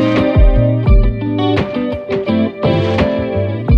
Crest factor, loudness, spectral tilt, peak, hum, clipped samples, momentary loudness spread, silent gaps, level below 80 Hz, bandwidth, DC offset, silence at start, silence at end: 12 dB; -15 LUFS; -9 dB/octave; -2 dBFS; none; under 0.1%; 7 LU; none; -18 dBFS; 6.2 kHz; under 0.1%; 0 s; 0 s